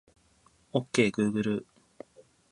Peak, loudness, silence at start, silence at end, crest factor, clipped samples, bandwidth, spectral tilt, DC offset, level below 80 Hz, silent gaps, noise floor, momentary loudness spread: -10 dBFS; -29 LUFS; 0.75 s; 0.9 s; 22 dB; under 0.1%; 11 kHz; -5.5 dB/octave; under 0.1%; -66 dBFS; none; -65 dBFS; 25 LU